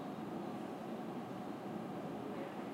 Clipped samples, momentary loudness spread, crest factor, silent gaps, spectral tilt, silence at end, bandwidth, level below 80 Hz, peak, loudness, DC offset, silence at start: under 0.1%; 1 LU; 12 dB; none; -7 dB/octave; 0 s; 16 kHz; -80 dBFS; -32 dBFS; -45 LUFS; under 0.1%; 0 s